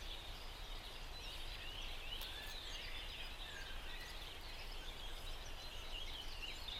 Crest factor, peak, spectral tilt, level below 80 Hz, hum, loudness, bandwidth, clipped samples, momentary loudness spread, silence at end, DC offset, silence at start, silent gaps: 16 dB; -32 dBFS; -2.5 dB/octave; -50 dBFS; none; -49 LUFS; 16 kHz; under 0.1%; 4 LU; 0 s; under 0.1%; 0 s; none